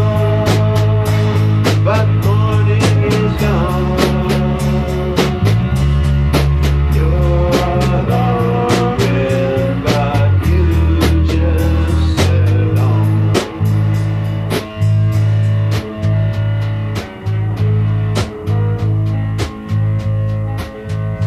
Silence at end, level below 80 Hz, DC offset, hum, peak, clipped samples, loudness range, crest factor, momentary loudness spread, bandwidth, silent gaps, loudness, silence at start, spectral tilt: 0 s; -22 dBFS; under 0.1%; none; 0 dBFS; under 0.1%; 4 LU; 12 dB; 6 LU; 14 kHz; none; -15 LUFS; 0 s; -7 dB/octave